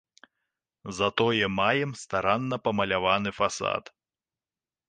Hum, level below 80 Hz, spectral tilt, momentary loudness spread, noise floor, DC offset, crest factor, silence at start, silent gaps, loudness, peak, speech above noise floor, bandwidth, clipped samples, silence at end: none; -58 dBFS; -4.5 dB/octave; 6 LU; under -90 dBFS; under 0.1%; 20 dB; 0.85 s; none; -26 LUFS; -8 dBFS; over 63 dB; 10 kHz; under 0.1%; 1.1 s